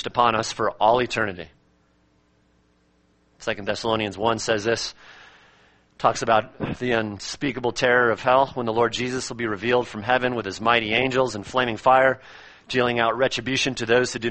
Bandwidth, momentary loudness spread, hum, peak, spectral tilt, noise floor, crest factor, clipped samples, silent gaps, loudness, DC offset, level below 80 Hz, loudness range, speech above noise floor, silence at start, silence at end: 8.8 kHz; 9 LU; none; -2 dBFS; -4 dB/octave; -63 dBFS; 22 dB; under 0.1%; none; -22 LUFS; under 0.1%; -52 dBFS; 6 LU; 40 dB; 0 s; 0 s